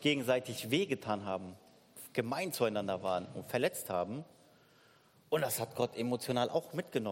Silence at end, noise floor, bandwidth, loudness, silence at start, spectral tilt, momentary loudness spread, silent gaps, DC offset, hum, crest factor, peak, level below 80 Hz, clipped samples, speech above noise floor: 0 s; -65 dBFS; 16.5 kHz; -35 LUFS; 0 s; -4.5 dB/octave; 8 LU; none; under 0.1%; none; 20 dB; -16 dBFS; -78 dBFS; under 0.1%; 30 dB